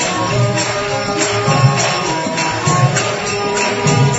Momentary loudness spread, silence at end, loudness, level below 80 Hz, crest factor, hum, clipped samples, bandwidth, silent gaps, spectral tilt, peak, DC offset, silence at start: 5 LU; 0 s; -15 LUFS; -44 dBFS; 14 dB; none; under 0.1%; 8 kHz; none; -4 dB/octave; 0 dBFS; under 0.1%; 0 s